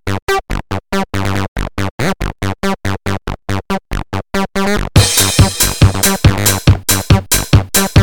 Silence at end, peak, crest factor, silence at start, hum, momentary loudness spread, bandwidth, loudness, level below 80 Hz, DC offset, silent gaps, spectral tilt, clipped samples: 0 s; 0 dBFS; 14 dB; 0 s; none; 11 LU; 19.5 kHz; -14 LUFS; -24 dBFS; 3%; 0.22-0.27 s, 1.48-1.55 s, 1.91-1.98 s; -4 dB/octave; under 0.1%